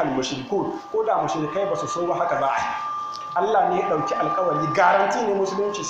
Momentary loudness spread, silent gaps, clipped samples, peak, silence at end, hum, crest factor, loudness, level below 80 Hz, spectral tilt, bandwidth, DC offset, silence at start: 8 LU; none; under 0.1%; -4 dBFS; 0 s; none; 18 dB; -23 LUFS; -60 dBFS; -4.5 dB/octave; 9 kHz; under 0.1%; 0 s